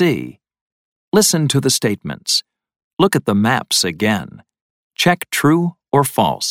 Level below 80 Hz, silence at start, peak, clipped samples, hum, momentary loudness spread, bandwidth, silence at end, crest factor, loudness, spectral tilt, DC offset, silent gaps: -54 dBFS; 0 s; 0 dBFS; under 0.1%; none; 10 LU; 17.5 kHz; 0 s; 18 dB; -16 LUFS; -4 dB/octave; under 0.1%; 0.61-1.12 s, 2.84-2.97 s, 4.61-4.90 s